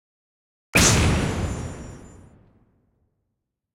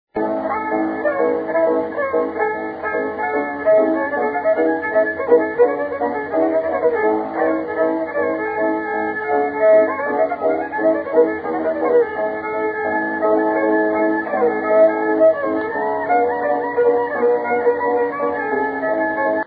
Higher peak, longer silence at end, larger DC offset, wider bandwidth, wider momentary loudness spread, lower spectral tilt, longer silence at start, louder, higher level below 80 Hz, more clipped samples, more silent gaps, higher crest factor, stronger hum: about the same, -4 dBFS vs -2 dBFS; first, 1.65 s vs 0 s; neither; first, 16.5 kHz vs 4.9 kHz; first, 21 LU vs 6 LU; second, -3.5 dB/octave vs -10 dB/octave; first, 0.75 s vs 0.15 s; about the same, -20 LUFS vs -18 LUFS; first, -36 dBFS vs -58 dBFS; neither; neither; first, 22 dB vs 16 dB; neither